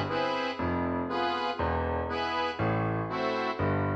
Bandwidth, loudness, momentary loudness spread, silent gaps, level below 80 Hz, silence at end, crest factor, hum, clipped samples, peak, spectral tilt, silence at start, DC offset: 8 kHz; -30 LUFS; 1 LU; none; -48 dBFS; 0 s; 14 dB; none; under 0.1%; -16 dBFS; -7 dB/octave; 0 s; under 0.1%